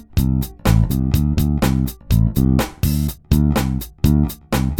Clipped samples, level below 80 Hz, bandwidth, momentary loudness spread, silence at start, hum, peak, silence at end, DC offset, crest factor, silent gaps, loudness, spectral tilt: under 0.1%; -24 dBFS; 18 kHz; 4 LU; 0.1 s; none; 0 dBFS; 0 s; under 0.1%; 16 dB; none; -18 LUFS; -6.5 dB/octave